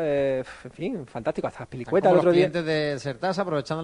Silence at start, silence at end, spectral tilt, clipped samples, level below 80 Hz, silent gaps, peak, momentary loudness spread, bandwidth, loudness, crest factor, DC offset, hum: 0 s; 0 s; -6.5 dB/octave; under 0.1%; -58 dBFS; none; -6 dBFS; 14 LU; 10.5 kHz; -25 LUFS; 18 dB; under 0.1%; none